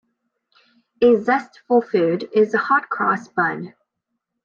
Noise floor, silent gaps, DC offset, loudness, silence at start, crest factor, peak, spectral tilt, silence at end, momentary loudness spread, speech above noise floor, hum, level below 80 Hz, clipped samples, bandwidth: -78 dBFS; none; under 0.1%; -19 LUFS; 1 s; 16 dB; -4 dBFS; -7 dB/octave; 0.75 s; 6 LU; 60 dB; none; -66 dBFS; under 0.1%; 7.2 kHz